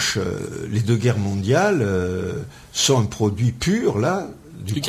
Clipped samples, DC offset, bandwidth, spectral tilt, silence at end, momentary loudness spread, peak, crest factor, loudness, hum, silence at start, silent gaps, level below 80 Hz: under 0.1%; under 0.1%; 15.5 kHz; -5 dB/octave; 0 s; 11 LU; -6 dBFS; 16 dB; -21 LUFS; none; 0 s; none; -42 dBFS